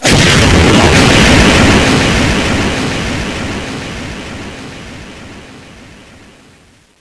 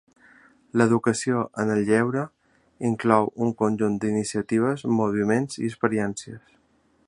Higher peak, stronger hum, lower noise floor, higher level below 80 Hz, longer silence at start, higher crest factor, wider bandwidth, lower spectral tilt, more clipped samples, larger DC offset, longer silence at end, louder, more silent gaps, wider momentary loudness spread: about the same, 0 dBFS vs -2 dBFS; neither; second, -45 dBFS vs -64 dBFS; first, -22 dBFS vs -60 dBFS; second, 0 s vs 0.75 s; second, 12 dB vs 22 dB; about the same, 11 kHz vs 11 kHz; second, -4 dB/octave vs -6 dB/octave; first, 0.4% vs under 0.1%; neither; first, 1.1 s vs 0.7 s; first, -9 LUFS vs -24 LUFS; neither; first, 22 LU vs 9 LU